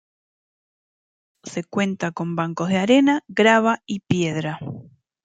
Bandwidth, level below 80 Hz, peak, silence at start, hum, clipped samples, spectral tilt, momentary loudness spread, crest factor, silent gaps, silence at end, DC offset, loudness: 9.4 kHz; -64 dBFS; -2 dBFS; 1.45 s; none; under 0.1%; -5.5 dB/octave; 16 LU; 20 dB; none; 0.4 s; under 0.1%; -20 LUFS